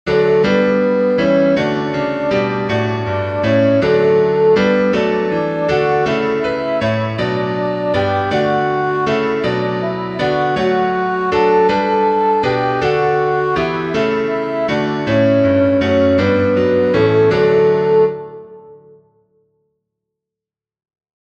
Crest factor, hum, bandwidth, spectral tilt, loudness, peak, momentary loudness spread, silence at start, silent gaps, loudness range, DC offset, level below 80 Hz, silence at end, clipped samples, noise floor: 14 dB; none; 8 kHz; -7.5 dB/octave; -15 LUFS; -2 dBFS; 6 LU; 0.05 s; none; 3 LU; under 0.1%; -46 dBFS; 2.45 s; under 0.1%; -88 dBFS